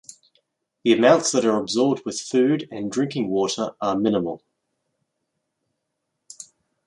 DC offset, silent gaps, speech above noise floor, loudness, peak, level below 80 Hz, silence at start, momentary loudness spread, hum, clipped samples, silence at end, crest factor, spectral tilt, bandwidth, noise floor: under 0.1%; none; 58 dB; -21 LUFS; -2 dBFS; -66 dBFS; 0.85 s; 14 LU; none; under 0.1%; 0.45 s; 22 dB; -4.5 dB/octave; 11.5 kHz; -79 dBFS